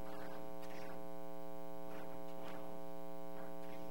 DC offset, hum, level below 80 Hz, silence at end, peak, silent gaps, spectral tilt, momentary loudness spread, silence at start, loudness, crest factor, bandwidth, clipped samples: 1%; none; -72 dBFS; 0 s; -32 dBFS; none; -6 dB/octave; 1 LU; 0 s; -51 LUFS; 14 dB; over 20 kHz; under 0.1%